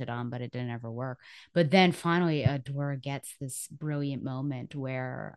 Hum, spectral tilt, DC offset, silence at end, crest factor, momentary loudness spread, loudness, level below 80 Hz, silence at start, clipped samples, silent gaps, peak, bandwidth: none; -6 dB/octave; under 0.1%; 0 s; 22 dB; 13 LU; -31 LUFS; -64 dBFS; 0 s; under 0.1%; none; -8 dBFS; 12.5 kHz